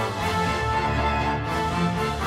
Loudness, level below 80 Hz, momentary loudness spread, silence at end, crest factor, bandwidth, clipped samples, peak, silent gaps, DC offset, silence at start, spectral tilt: -24 LUFS; -34 dBFS; 2 LU; 0 s; 12 dB; 16 kHz; under 0.1%; -12 dBFS; none; under 0.1%; 0 s; -5.5 dB/octave